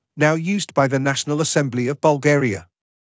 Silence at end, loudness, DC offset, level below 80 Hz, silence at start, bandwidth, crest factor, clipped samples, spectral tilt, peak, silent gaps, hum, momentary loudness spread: 0.55 s; -19 LUFS; under 0.1%; -56 dBFS; 0.15 s; 8 kHz; 16 dB; under 0.1%; -5 dB/octave; -4 dBFS; none; none; 5 LU